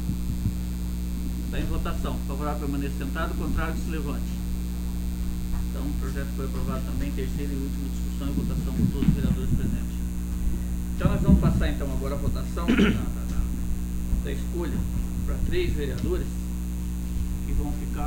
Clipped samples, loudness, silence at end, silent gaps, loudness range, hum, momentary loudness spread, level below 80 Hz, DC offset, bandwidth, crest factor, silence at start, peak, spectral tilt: under 0.1%; -28 LUFS; 0 s; none; 5 LU; 60 Hz at -30 dBFS; 8 LU; -28 dBFS; under 0.1%; 16.5 kHz; 20 dB; 0 s; -6 dBFS; -6.5 dB/octave